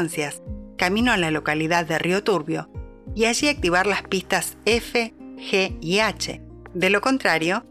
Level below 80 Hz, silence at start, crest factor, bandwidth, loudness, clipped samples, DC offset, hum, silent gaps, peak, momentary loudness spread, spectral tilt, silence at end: -44 dBFS; 0 s; 18 dB; 15 kHz; -22 LUFS; under 0.1%; under 0.1%; none; none; -4 dBFS; 14 LU; -4 dB/octave; 0.1 s